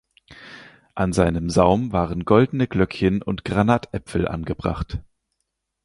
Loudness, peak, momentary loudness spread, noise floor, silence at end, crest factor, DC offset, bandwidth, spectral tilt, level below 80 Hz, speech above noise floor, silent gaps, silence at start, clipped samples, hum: -21 LUFS; -2 dBFS; 15 LU; -77 dBFS; 0.85 s; 20 dB; under 0.1%; 11.5 kHz; -7 dB/octave; -38 dBFS; 57 dB; none; 0.3 s; under 0.1%; none